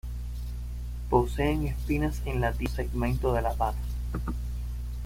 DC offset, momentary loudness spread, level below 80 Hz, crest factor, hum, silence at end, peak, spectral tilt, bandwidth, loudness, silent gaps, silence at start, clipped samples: under 0.1%; 11 LU; -32 dBFS; 20 dB; 60 Hz at -35 dBFS; 0 s; -8 dBFS; -7 dB/octave; 16 kHz; -30 LUFS; none; 0.05 s; under 0.1%